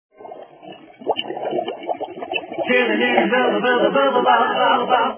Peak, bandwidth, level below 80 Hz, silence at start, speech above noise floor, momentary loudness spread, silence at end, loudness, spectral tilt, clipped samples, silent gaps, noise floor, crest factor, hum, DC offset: 0 dBFS; 3.5 kHz; -68 dBFS; 0.2 s; 24 dB; 12 LU; 0 s; -18 LUFS; -8 dB/octave; under 0.1%; none; -41 dBFS; 18 dB; none; under 0.1%